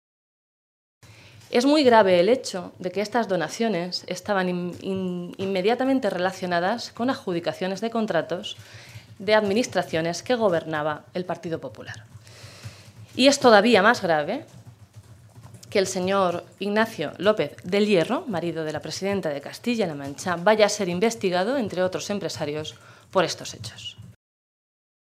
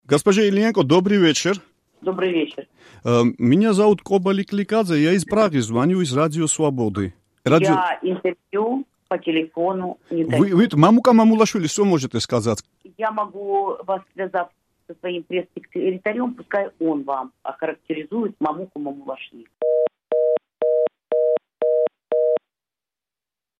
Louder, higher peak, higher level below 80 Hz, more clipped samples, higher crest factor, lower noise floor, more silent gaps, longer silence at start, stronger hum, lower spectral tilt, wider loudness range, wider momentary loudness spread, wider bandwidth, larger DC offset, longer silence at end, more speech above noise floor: second, -23 LUFS vs -20 LUFS; about the same, -2 dBFS vs 0 dBFS; second, -68 dBFS vs -62 dBFS; neither; about the same, 24 dB vs 20 dB; second, -48 dBFS vs -90 dBFS; neither; first, 1.5 s vs 0.1 s; neither; about the same, -4.5 dB/octave vs -5.5 dB/octave; about the same, 6 LU vs 8 LU; first, 15 LU vs 12 LU; first, 15 kHz vs 13 kHz; neither; second, 1 s vs 1.25 s; second, 25 dB vs 70 dB